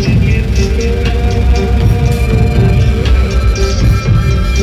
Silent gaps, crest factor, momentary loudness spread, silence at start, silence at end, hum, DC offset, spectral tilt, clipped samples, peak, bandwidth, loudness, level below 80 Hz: none; 8 dB; 3 LU; 0 s; 0 s; none; under 0.1%; -6.5 dB/octave; under 0.1%; -2 dBFS; 13 kHz; -12 LUFS; -12 dBFS